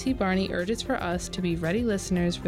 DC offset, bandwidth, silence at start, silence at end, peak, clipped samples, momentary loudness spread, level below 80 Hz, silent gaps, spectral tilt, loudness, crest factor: under 0.1%; 15 kHz; 0 s; 0 s; -16 dBFS; under 0.1%; 4 LU; -42 dBFS; none; -5.5 dB/octave; -28 LUFS; 10 dB